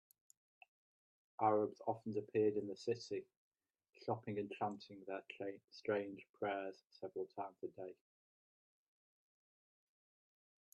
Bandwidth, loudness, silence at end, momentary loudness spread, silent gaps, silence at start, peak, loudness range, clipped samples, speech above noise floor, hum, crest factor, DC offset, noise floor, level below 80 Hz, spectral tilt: 10 kHz; -43 LUFS; 2.8 s; 14 LU; 3.37-3.52 s, 3.89-3.93 s, 5.64-5.68 s, 6.30-6.34 s; 1.4 s; -22 dBFS; 12 LU; under 0.1%; 33 dB; none; 22 dB; under 0.1%; -75 dBFS; -88 dBFS; -6.5 dB/octave